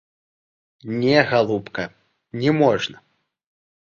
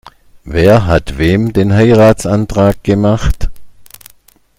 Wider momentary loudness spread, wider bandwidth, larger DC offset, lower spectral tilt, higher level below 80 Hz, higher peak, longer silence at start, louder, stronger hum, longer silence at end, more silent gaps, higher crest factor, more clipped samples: first, 16 LU vs 10 LU; second, 7.4 kHz vs 16 kHz; neither; about the same, -6.5 dB/octave vs -7 dB/octave; second, -60 dBFS vs -24 dBFS; about the same, 0 dBFS vs 0 dBFS; first, 0.85 s vs 0.45 s; second, -20 LUFS vs -11 LUFS; neither; first, 1 s vs 0.75 s; neither; first, 22 dB vs 12 dB; second, under 0.1% vs 0.3%